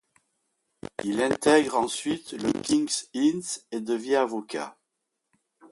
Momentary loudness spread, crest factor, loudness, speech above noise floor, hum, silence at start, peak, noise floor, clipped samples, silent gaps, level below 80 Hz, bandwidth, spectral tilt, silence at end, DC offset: 14 LU; 22 dB; -26 LUFS; 55 dB; none; 1.05 s; -6 dBFS; -81 dBFS; under 0.1%; none; -64 dBFS; 11.5 kHz; -3.5 dB/octave; 0.05 s; under 0.1%